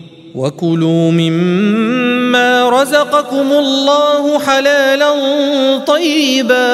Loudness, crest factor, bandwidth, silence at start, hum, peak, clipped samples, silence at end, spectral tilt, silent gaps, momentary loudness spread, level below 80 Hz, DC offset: -11 LUFS; 12 dB; 15.5 kHz; 0 s; none; 0 dBFS; under 0.1%; 0 s; -5 dB/octave; none; 3 LU; -62 dBFS; under 0.1%